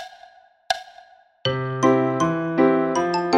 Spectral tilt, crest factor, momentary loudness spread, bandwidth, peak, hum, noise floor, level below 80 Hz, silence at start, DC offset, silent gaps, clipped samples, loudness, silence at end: -5.5 dB/octave; 20 dB; 9 LU; 11.5 kHz; -2 dBFS; none; -50 dBFS; -58 dBFS; 0 s; under 0.1%; none; under 0.1%; -21 LUFS; 0 s